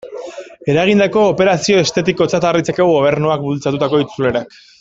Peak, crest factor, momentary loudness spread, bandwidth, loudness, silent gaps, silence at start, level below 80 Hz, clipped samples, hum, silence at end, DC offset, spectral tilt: -2 dBFS; 12 dB; 12 LU; 8 kHz; -14 LUFS; none; 0.05 s; -50 dBFS; under 0.1%; none; 0.35 s; under 0.1%; -5.5 dB/octave